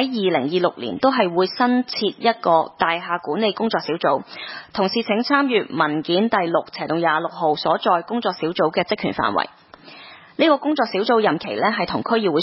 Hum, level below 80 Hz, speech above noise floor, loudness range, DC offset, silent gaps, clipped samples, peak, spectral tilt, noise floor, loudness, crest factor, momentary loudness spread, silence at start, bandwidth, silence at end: none; -60 dBFS; 22 dB; 2 LU; under 0.1%; none; under 0.1%; -2 dBFS; -9 dB/octave; -42 dBFS; -20 LUFS; 18 dB; 6 LU; 0 s; 5.8 kHz; 0 s